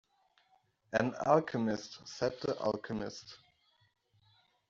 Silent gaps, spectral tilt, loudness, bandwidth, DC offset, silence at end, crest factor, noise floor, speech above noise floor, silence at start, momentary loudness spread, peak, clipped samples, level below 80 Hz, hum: none; -4.5 dB/octave; -34 LUFS; 7.6 kHz; under 0.1%; 1.35 s; 22 dB; -72 dBFS; 38 dB; 0.9 s; 15 LU; -14 dBFS; under 0.1%; -68 dBFS; none